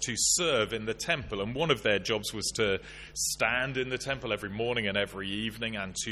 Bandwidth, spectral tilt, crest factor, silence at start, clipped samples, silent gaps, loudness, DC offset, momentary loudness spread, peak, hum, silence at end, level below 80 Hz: 13.5 kHz; -2.5 dB/octave; 20 dB; 0 s; under 0.1%; none; -29 LUFS; under 0.1%; 8 LU; -10 dBFS; none; 0 s; -52 dBFS